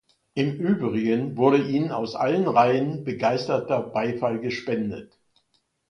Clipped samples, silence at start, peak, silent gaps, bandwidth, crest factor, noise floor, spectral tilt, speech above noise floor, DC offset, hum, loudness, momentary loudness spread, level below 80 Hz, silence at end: under 0.1%; 0.35 s; -4 dBFS; none; 10 kHz; 20 dB; -71 dBFS; -7.5 dB/octave; 47 dB; under 0.1%; none; -24 LUFS; 9 LU; -64 dBFS; 0.85 s